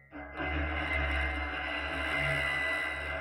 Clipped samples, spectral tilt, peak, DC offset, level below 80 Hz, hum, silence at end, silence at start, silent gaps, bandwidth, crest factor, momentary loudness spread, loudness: under 0.1%; -5 dB/octave; -20 dBFS; under 0.1%; -40 dBFS; none; 0 s; 0.1 s; none; 16 kHz; 14 dB; 5 LU; -32 LUFS